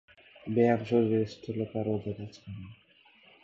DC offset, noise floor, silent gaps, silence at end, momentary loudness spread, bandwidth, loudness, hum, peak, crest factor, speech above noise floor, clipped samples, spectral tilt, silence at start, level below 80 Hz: under 0.1%; -61 dBFS; none; 0.7 s; 19 LU; 7.4 kHz; -29 LUFS; none; -12 dBFS; 18 dB; 31 dB; under 0.1%; -8.5 dB/octave; 0.45 s; -62 dBFS